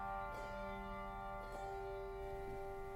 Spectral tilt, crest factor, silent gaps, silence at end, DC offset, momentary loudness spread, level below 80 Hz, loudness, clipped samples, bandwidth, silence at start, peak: -6 dB/octave; 12 dB; none; 0 s; under 0.1%; 2 LU; -54 dBFS; -48 LUFS; under 0.1%; 16 kHz; 0 s; -34 dBFS